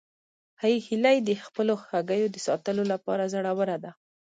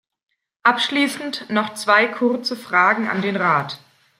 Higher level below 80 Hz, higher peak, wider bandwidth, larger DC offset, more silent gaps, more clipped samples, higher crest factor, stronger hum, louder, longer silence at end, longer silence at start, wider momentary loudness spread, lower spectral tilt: about the same, -76 dBFS vs -72 dBFS; second, -10 dBFS vs -2 dBFS; second, 9.4 kHz vs 16 kHz; neither; neither; neither; about the same, 18 dB vs 20 dB; neither; second, -27 LUFS vs -19 LUFS; about the same, 0.4 s vs 0.45 s; about the same, 0.6 s vs 0.65 s; about the same, 7 LU vs 8 LU; first, -5.5 dB/octave vs -4 dB/octave